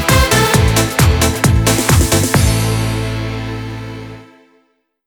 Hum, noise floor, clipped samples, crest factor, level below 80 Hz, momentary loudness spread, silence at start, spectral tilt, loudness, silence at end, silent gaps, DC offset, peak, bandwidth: none; -59 dBFS; under 0.1%; 14 dB; -22 dBFS; 15 LU; 0 s; -4.5 dB/octave; -13 LUFS; 0.85 s; none; under 0.1%; 0 dBFS; over 20 kHz